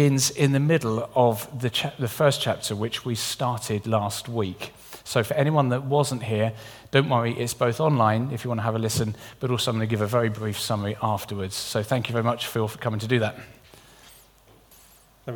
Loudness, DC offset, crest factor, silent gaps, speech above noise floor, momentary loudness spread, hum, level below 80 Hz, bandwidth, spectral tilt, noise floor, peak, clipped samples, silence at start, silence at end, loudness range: -25 LUFS; under 0.1%; 22 dB; none; 31 dB; 8 LU; none; -58 dBFS; 19 kHz; -5 dB/octave; -55 dBFS; -2 dBFS; under 0.1%; 0 s; 0 s; 4 LU